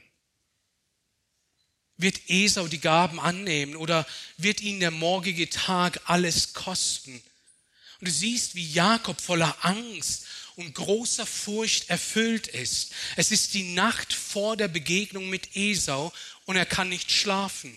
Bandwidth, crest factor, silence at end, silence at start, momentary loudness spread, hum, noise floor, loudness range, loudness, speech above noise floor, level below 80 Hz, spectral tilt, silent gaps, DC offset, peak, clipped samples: 14.5 kHz; 20 dB; 0 s; 2 s; 8 LU; none; -76 dBFS; 2 LU; -25 LUFS; 49 dB; -60 dBFS; -2.5 dB/octave; none; under 0.1%; -8 dBFS; under 0.1%